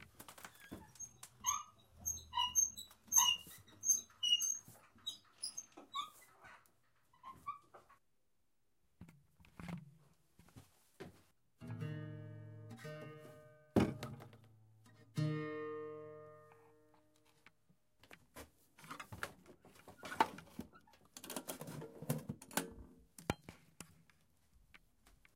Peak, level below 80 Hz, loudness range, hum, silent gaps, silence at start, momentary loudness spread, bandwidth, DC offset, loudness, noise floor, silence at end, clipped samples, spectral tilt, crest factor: -16 dBFS; -70 dBFS; 22 LU; none; none; 0 s; 25 LU; 16 kHz; under 0.1%; -40 LUFS; -86 dBFS; 0.25 s; under 0.1%; -2 dB/octave; 30 dB